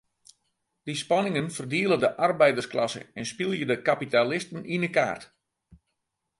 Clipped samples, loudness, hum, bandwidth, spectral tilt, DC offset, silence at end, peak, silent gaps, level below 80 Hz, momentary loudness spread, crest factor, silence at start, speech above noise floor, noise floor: under 0.1%; -26 LUFS; none; 11.5 kHz; -5 dB/octave; under 0.1%; 0.65 s; -6 dBFS; none; -68 dBFS; 11 LU; 20 dB; 0.85 s; 55 dB; -81 dBFS